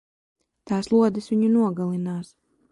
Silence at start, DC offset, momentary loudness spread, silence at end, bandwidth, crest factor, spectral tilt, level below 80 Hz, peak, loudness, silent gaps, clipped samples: 0.65 s; under 0.1%; 10 LU; 0.45 s; 11 kHz; 14 dB; -8 dB/octave; -64 dBFS; -8 dBFS; -23 LUFS; none; under 0.1%